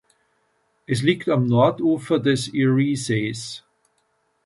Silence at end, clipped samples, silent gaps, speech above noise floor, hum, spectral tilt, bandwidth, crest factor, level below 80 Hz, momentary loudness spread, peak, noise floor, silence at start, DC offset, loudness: 0.85 s; under 0.1%; none; 48 dB; none; -6 dB/octave; 11.5 kHz; 20 dB; -60 dBFS; 10 LU; -4 dBFS; -68 dBFS; 0.9 s; under 0.1%; -21 LUFS